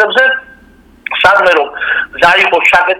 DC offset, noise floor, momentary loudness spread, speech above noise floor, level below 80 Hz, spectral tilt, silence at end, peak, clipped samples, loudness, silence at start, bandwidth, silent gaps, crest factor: under 0.1%; -42 dBFS; 11 LU; 33 dB; -46 dBFS; -2.5 dB/octave; 0 s; 0 dBFS; 0.7%; -9 LUFS; 0 s; 19 kHz; none; 10 dB